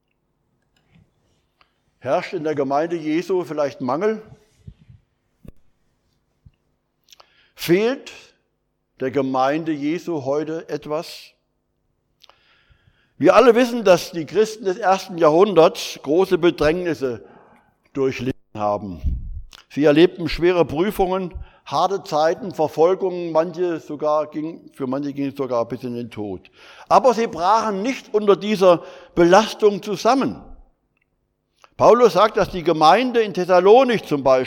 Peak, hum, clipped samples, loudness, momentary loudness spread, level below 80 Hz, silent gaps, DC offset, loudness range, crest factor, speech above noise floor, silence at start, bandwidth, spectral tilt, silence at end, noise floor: -2 dBFS; none; under 0.1%; -19 LUFS; 15 LU; -42 dBFS; none; under 0.1%; 10 LU; 18 dB; 53 dB; 2.05 s; 17.5 kHz; -5.5 dB/octave; 0 s; -71 dBFS